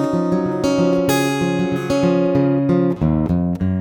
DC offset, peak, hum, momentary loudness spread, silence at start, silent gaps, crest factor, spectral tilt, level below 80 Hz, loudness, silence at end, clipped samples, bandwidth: under 0.1%; -6 dBFS; none; 3 LU; 0 s; none; 12 dB; -7 dB/octave; -38 dBFS; -18 LUFS; 0 s; under 0.1%; 19 kHz